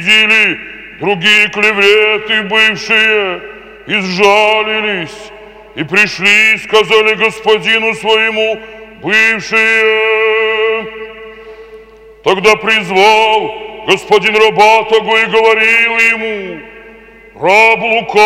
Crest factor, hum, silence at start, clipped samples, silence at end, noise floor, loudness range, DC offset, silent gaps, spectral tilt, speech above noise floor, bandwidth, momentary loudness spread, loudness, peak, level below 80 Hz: 12 dB; none; 0 s; 0.3%; 0 s; -37 dBFS; 3 LU; under 0.1%; none; -3 dB/octave; 27 dB; 15.5 kHz; 15 LU; -9 LUFS; 0 dBFS; -48 dBFS